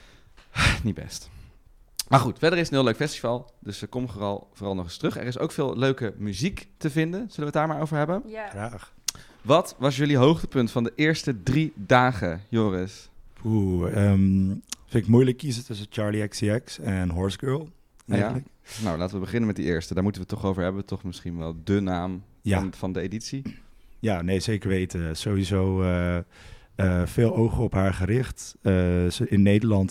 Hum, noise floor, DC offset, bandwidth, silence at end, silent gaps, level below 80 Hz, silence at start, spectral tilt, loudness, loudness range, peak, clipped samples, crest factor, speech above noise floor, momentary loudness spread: none; -53 dBFS; under 0.1%; 15.5 kHz; 0 s; none; -44 dBFS; 0.55 s; -6 dB/octave; -25 LUFS; 5 LU; -6 dBFS; under 0.1%; 20 dB; 29 dB; 13 LU